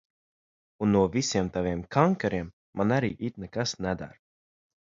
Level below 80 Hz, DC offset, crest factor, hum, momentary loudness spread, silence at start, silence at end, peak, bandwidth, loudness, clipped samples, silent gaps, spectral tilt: -52 dBFS; under 0.1%; 24 dB; none; 11 LU; 0.8 s; 0.85 s; -6 dBFS; 7.6 kHz; -28 LUFS; under 0.1%; 2.53-2.73 s; -5.5 dB/octave